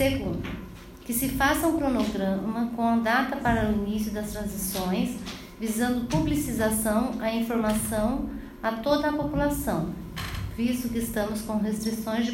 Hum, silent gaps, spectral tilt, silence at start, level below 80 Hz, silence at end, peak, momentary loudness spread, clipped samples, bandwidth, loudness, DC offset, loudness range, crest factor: none; none; -5 dB/octave; 0 s; -42 dBFS; 0 s; -10 dBFS; 10 LU; under 0.1%; 16.5 kHz; -27 LUFS; under 0.1%; 3 LU; 18 dB